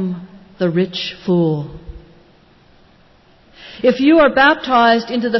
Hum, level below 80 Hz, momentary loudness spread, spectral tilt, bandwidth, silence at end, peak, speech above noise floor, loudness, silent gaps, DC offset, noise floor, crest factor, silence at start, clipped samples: none; -46 dBFS; 14 LU; -7 dB/octave; 6 kHz; 0 s; -2 dBFS; 35 dB; -15 LUFS; none; under 0.1%; -50 dBFS; 16 dB; 0 s; under 0.1%